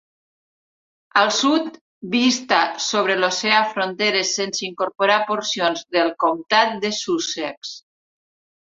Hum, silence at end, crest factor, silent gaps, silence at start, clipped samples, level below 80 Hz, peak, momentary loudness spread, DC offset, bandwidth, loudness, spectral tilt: none; 0.85 s; 20 dB; 1.81-2.01 s, 7.57-7.62 s; 1.15 s; under 0.1%; -70 dBFS; -2 dBFS; 9 LU; under 0.1%; 7.8 kHz; -19 LUFS; -2 dB/octave